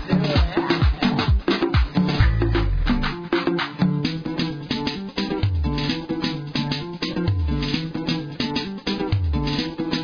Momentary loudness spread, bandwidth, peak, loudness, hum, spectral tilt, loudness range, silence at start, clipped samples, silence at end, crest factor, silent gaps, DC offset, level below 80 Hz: 6 LU; 5.4 kHz; -6 dBFS; -23 LUFS; none; -7 dB/octave; 4 LU; 0 s; under 0.1%; 0 s; 16 dB; none; under 0.1%; -28 dBFS